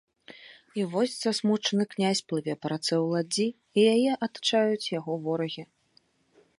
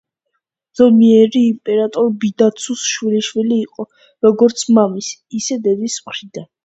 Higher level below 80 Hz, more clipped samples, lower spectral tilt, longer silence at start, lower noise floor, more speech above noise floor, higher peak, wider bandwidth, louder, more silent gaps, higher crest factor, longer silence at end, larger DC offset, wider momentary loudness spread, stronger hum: second, -76 dBFS vs -62 dBFS; neither; about the same, -4.5 dB/octave vs -4.5 dB/octave; second, 0.3 s vs 0.75 s; second, -66 dBFS vs -73 dBFS; second, 39 dB vs 58 dB; second, -10 dBFS vs 0 dBFS; first, 11.5 kHz vs 8.2 kHz; second, -27 LUFS vs -15 LUFS; neither; about the same, 18 dB vs 14 dB; first, 0.95 s vs 0.2 s; neither; second, 9 LU vs 17 LU; neither